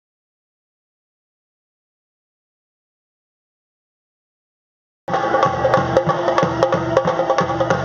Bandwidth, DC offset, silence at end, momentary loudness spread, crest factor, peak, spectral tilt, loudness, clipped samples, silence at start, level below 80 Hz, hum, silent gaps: 7.4 kHz; under 0.1%; 0 s; 4 LU; 22 dB; 0 dBFS; -4.5 dB/octave; -18 LUFS; under 0.1%; 5.1 s; -48 dBFS; none; none